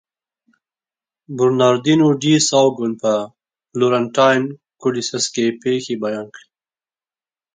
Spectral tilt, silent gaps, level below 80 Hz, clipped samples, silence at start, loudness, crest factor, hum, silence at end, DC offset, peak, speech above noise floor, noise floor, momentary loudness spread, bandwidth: -4.5 dB/octave; none; -64 dBFS; under 0.1%; 1.3 s; -17 LUFS; 18 dB; none; 1.15 s; under 0.1%; -2 dBFS; over 73 dB; under -90 dBFS; 13 LU; 9.6 kHz